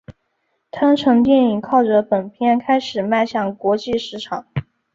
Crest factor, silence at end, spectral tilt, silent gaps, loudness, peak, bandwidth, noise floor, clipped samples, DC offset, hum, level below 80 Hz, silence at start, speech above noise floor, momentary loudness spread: 16 dB; 0.35 s; -6.5 dB/octave; none; -18 LUFS; -2 dBFS; 7.6 kHz; -70 dBFS; under 0.1%; under 0.1%; none; -52 dBFS; 0.1 s; 53 dB; 13 LU